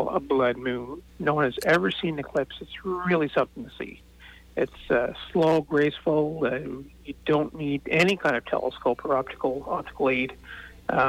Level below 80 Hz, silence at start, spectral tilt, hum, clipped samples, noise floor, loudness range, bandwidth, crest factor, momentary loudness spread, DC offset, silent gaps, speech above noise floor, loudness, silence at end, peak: -52 dBFS; 0 s; -6 dB/octave; none; under 0.1%; -49 dBFS; 2 LU; 18.5 kHz; 16 dB; 14 LU; under 0.1%; none; 24 dB; -26 LUFS; 0 s; -10 dBFS